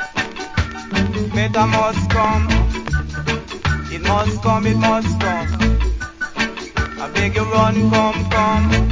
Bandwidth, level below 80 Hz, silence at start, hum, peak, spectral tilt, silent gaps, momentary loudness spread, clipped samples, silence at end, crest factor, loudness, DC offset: 7.6 kHz; -24 dBFS; 0 s; none; 0 dBFS; -6 dB/octave; none; 7 LU; under 0.1%; 0 s; 18 dB; -18 LUFS; under 0.1%